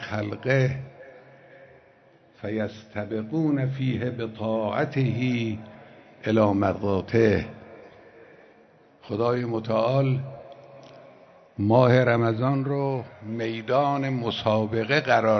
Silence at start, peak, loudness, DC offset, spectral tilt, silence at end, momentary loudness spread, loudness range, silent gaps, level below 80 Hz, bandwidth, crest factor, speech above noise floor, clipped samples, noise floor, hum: 0 s; -4 dBFS; -25 LUFS; under 0.1%; -8 dB/octave; 0 s; 14 LU; 6 LU; none; -60 dBFS; 6.4 kHz; 20 dB; 33 dB; under 0.1%; -56 dBFS; none